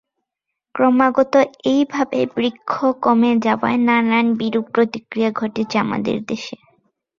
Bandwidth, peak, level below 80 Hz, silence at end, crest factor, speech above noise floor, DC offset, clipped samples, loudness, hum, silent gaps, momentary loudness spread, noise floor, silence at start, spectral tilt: 7.2 kHz; -2 dBFS; -60 dBFS; 0.65 s; 16 dB; 64 dB; under 0.1%; under 0.1%; -18 LUFS; none; none; 8 LU; -81 dBFS; 0.75 s; -6 dB/octave